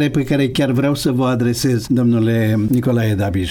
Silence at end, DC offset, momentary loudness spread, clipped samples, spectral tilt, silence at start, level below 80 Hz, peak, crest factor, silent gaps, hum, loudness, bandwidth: 0 s; under 0.1%; 2 LU; under 0.1%; -6.5 dB/octave; 0 s; -42 dBFS; -6 dBFS; 10 dB; none; none; -16 LUFS; 18 kHz